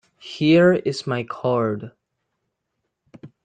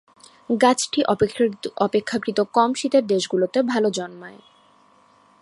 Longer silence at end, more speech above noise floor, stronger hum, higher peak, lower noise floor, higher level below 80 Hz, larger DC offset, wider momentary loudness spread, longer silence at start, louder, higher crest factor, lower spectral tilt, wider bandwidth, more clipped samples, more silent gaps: second, 0.2 s vs 1.05 s; first, 58 dB vs 35 dB; neither; second, -6 dBFS vs -2 dBFS; first, -77 dBFS vs -56 dBFS; about the same, -62 dBFS vs -60 dBFS; neither; first, 18 LU vs 9 LU; second, 0.25 s vs 0.5 s; about the same, -20 LUFS vs -21 LUFS; about the same, 18 dB vs 20 dB; first, -7 dB/octave vs -4 dB/octave; second, 9.2 kHz vs 11.5 kHz; neither; neither